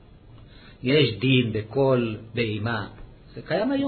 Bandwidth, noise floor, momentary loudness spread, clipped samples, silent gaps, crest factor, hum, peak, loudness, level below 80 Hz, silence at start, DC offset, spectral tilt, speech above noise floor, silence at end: 4.6 kHz; -48 dBFS; 13 LU; under 0.1%; none; 18 dB; none; -8 dBFS; -24 LUFS; -52 dBFS; 0.1 s; under 0.1%; -10 dB/octave; 25 dB; 0 s